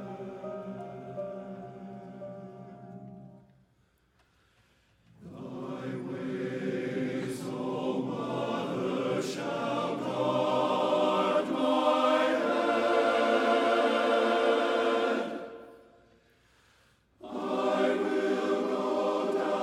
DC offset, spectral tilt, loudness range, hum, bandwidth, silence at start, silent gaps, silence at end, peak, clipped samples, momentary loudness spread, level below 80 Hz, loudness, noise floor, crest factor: under 0.1%; -5.5 dB/octave; 19 LU; none; 14 kHz; 0 s; none; 0 s; -14 dBFS; under 0.1%; 18 LU; -72 dBFS; -29 LUFS; -69 dBFS; 18 dB